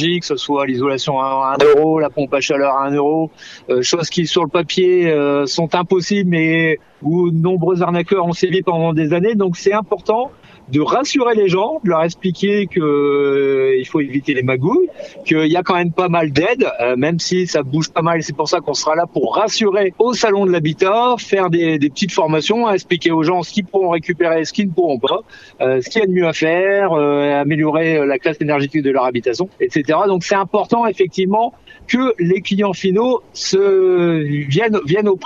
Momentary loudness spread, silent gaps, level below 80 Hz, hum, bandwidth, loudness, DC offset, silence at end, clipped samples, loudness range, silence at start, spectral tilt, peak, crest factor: 4 LU; none; -56 dBFS; none; 7.8 kHz; -16 LUFS; under 0.1%; 0 s; under 0.1%; 1 LU; 0 s; -5.5 dB/octave; 0 dBFS; 16 dB